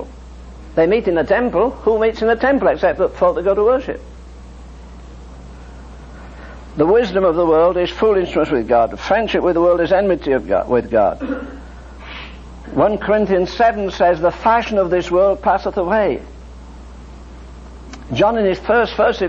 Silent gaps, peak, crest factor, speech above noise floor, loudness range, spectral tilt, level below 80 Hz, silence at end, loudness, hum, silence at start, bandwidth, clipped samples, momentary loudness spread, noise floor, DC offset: none; -2 dBFS; 14 dB; 20 dB; 5 LU; -6.5 dB/octave; -36 dBFS; 0 s; -16 LUFS; none; 0 s; 8 kHz; under 0.1%; 22 LU; -36 dBFS; under 0.1%